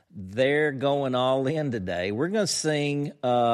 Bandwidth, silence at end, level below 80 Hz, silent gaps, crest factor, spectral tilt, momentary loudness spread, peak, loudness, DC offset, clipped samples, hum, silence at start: 14 kHz; 0 s; -64 dBFS; none; 14 dB; -4.5 dB/octave; 5 LU; -12 dBFS; -26 LUFS; under 0.1%; under 0.1%; none; 0.15 s